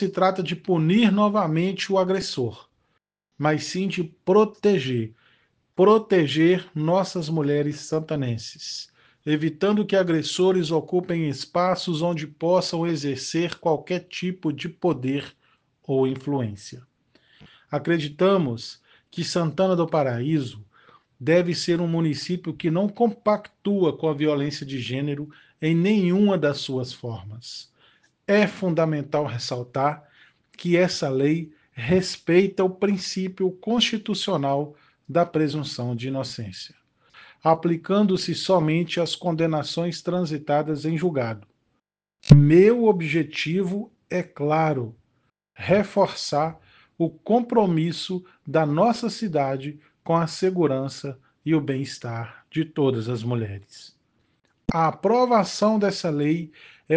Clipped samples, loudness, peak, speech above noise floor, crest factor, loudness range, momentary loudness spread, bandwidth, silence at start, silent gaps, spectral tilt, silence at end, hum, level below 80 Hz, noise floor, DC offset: under 0.1%; -23 LUFS; 0 dBFS; 54 dB; 24 dB; 5 LU; 12 LU; 9.6 kHz; 0 s; none; -6.5 dB/octave; 0 s; none; -52 dBFS; -76 dBFS; under 0.1%